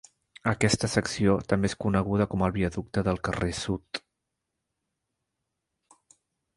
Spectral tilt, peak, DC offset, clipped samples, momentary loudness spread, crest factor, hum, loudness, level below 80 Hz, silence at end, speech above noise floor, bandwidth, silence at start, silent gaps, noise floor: -5.5 dB/octave; -6 dBFS; under 0.1%; under 0.1%; 7 LU; 22 dB; none; -27 LUFS; -46 dBFS; 2.6 s; 57 dB; 11.5 kHz; 0.45 s; none; -83 dBFS